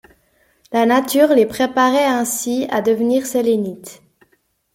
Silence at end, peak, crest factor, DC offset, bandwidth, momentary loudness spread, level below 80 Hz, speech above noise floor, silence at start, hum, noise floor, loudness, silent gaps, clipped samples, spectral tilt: 0.8 s; -2 dBFS; 16 dB; under 0.1%; 16.5 kHz; 7 LU; -60 dBFS; 47 dB; 0.7 s; none; -63 dBFS; -16 LUFS; none; under 0.1%; -3.5 dB/octave